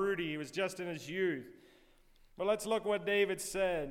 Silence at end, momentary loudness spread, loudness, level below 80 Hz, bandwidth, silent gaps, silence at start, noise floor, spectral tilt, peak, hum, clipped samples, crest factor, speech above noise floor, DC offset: 0 s; 8 LU; -35 LUFS; -62 dBFS; 16.5 kHz; none; 0 s; -64 dBFS; -4 dB/octave; -20 dBFS; none; under 0.1%; 16 dB; 29 dB; under 0.1%